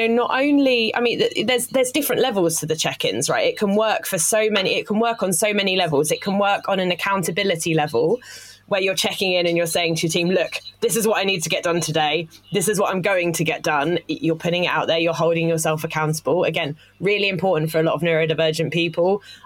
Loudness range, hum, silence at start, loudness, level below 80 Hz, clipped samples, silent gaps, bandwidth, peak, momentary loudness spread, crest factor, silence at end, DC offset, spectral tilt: 2 LU; none; 0 s; -20 LUFS; -60 dBFS; under 0.1%; none; 17 kHz; -4 dBFS; 4 LU; 16 dB; 0.1 s; under 0.1%; -3.5 dB/octave